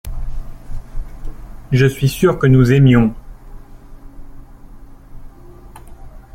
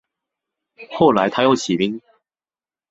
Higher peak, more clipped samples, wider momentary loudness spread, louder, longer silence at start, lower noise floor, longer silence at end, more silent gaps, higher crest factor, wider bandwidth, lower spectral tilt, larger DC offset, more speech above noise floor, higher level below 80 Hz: about the same, -2 dBFS vs -2 dBFS; neither; first, 26 LU vs 15 LU; first, -13 LUFS vs -17 LUFS; second, 0.05 s vs 0.8 s; second, -37 dBFS vs under -90 dBFS; second, 0.15 s vs 0.9 s; neither; about the same, 16 dB vs 20 dB; first, 15.5 kHz vs 8.4 kHz; first, -7.5 dB/octave vs -5 dB/octave; neither; second, 26 dB vs over 73 dB; first, -30 dBFS vs -58 dBFS